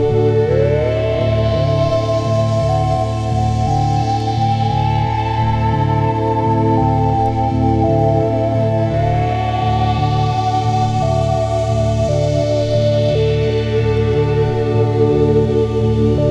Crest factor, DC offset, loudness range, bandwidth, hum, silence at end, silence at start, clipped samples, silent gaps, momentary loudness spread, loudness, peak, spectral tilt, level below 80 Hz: 12 dB; under 0.1%; 1 LU; 8.4 kHz; none; 0 s; 0 s; under 0.1%; none; 3 LU; -16 LUFS; -2 dBFS; -8 dB/octave; -28 dBFS